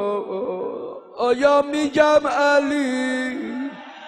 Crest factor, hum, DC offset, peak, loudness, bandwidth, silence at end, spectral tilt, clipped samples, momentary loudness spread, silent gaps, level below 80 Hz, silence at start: 18 dB; none; under 0.1%; -2 dBFS; -20 LUFS; 10.5 kHz; 0 s; -4 dB/octave; under 0.1%; 14 LU; none; -60 dBFS; 0 s